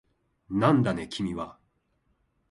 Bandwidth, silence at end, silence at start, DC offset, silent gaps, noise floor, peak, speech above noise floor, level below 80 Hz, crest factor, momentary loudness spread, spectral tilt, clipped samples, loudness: 11.5 kHz; 1 s; 0.5 s; under 0.1%; none; -72 dBFS; -8 dBFS; 46 dB; -56 dBFS; 22 dB; 14 LU; -7 dB/octave; under 0.1%; -27 LUFS